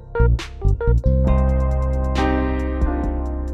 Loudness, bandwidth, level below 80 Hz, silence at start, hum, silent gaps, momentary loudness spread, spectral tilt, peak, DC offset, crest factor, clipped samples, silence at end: -20 LUFS; 7.6 kHz; -20 dBFS; 0 s; none; none; 5 LU; -8 dB/octave; -6 dBFS; under 0.1%; 14 dB; under 0.1%; 0 s